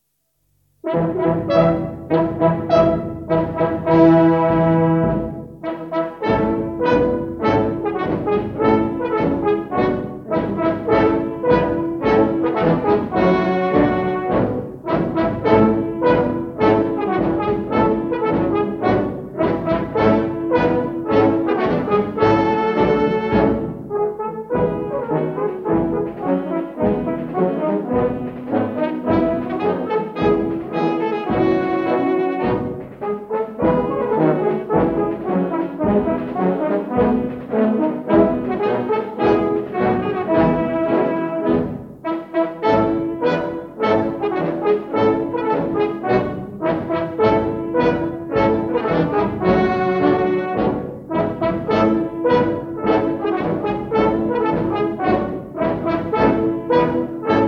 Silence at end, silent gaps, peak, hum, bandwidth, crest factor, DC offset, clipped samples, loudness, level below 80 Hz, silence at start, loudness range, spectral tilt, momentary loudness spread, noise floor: 0 s; none; -2 dBFS; none; 6.2 kHz; 18 dB; under 0.1%; under 0.1%; -19 LUFS; -42 dBFS; 0.85 s; 3 LU; -9 dB/octave; 6 LU; -68 dBFS